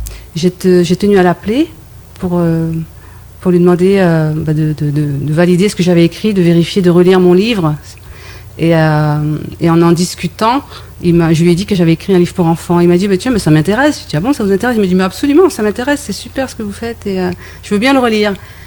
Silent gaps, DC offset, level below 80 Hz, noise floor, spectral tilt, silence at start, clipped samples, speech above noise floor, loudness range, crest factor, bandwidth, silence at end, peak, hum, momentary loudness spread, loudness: none; under 0.1%; -38 dBFS; -33 dBFS; -6.5 dB/octave; 0 s; under 0.1%; 23 dB; 3 LU; 12 dB; 19 kHz; 0 s; 0 dBFS; none; 10 LU; -11 LUFS